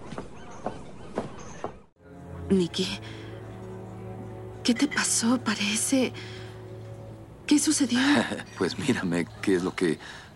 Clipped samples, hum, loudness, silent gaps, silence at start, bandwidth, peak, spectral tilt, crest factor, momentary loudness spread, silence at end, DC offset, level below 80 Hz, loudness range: under 0.1%; none; -26 LUFS; 1.92-1.96 s; 0 s; 15 kHz; -10 dBFS; -3.5 dB/octave; 18 dB; 19 LU; 0 s; under 0.1%; -56 dBFS; 7 LU